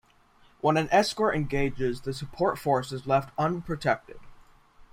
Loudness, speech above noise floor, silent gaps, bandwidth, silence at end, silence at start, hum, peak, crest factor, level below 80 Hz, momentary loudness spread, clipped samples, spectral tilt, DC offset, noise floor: -27 LUFS; 33 dB; none; 16 kHz; 0.1 s; 0.65 s; none; -8 dBFS; 20 dB; -48 dBFS; 8 LU; under 0.1%; -5.5 dB/octave; under 0.1%; -60 dBFS